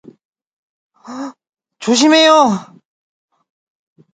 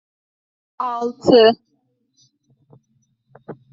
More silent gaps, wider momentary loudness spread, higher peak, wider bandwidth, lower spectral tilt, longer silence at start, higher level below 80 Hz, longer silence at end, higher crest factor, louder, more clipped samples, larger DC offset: neither; second, 21 LU vs 26 LU; about the same, 0 dBFS vs -2 dBFS; first, 9.4 kHz vs 7.4 kHz; about the same, -3 dB/octave vs -3 dB/octave; first, 1.1 s vs 0.8 s; second, -68 dBFS vs -62 dBFS; first, 1.5 s vs 0.2 s; about the same, 18 dB vs 20 dB; first, -11 LUFS vs -16 LUFS; neither; neither